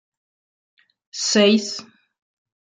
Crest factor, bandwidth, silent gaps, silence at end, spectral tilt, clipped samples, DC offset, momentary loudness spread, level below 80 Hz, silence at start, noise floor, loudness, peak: 20 dB; 9.4 kHz; none; 0.95 s; -3 dB/octave; under 0.1%; under 0.1%; 18 LU; -72 dBFS; 1.15 s; under -90 dBFS; -18 LUFS; -4 dBFS